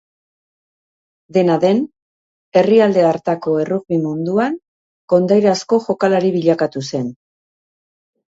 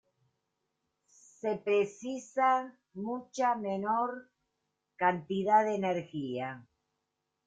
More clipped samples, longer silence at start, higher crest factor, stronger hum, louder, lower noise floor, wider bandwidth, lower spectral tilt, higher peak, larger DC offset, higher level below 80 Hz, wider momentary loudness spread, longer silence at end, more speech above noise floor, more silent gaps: neither; about the same, 1.35 s vs 1.45 s; about the same, 16 dB vs 20 dB; neither; first, -16 LUFS vs -32 LUFS; first, under -90 dBFS vs -84 dBFS; second, 8 kHz vs 9 kHz; about the same, -6.5 dB/octave vs -5.5 dB/octave; first, 0 dBFS vs -14 dBFS; neither; first, -62 dBFS vs -78 dBFS; second, 10 LU vs 14 LU; first, 1.2 s vs 0.85 s; first, over 75 dB vs 53 dB; first, 2.02-2.52 s, 4.68-5.08 s vs none